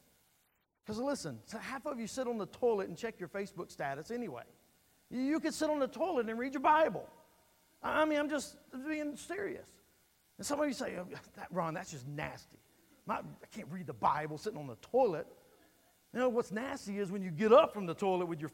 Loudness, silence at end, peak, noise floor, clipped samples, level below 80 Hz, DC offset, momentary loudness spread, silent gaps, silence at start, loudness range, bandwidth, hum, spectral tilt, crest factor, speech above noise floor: -36 LUFS; 0.05 s; -12 dBFS; -77 dBFS; under 0.1%; -70 dBFS; under 0.1%; 14 LU; none; 0.85 s; 7 LU; 16 kHz; none; -5 dB/octave; 24 dB; 41 dB